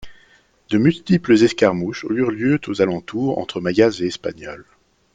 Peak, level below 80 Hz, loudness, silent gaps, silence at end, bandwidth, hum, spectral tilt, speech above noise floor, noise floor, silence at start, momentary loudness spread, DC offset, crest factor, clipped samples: 0 dBFS; -54 dBFS; -19 LUFS; none; 0.5 s; 9 kHz; none; -6.5 dB/octave; 36 dB; -55 dBFS; 0 s; 13 LU; under 0.1%; 18 dB; under 0.1%